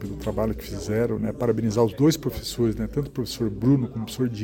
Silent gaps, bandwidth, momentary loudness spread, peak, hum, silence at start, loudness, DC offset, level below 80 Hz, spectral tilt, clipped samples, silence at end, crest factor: none; 17 kHz; 8 LU; -8 dBFS; none; 0 s; -25 LUFS; under 0.1%; -42 dBFS; -6.5 dB/octave; under 0.1%; 0 s; 18 dB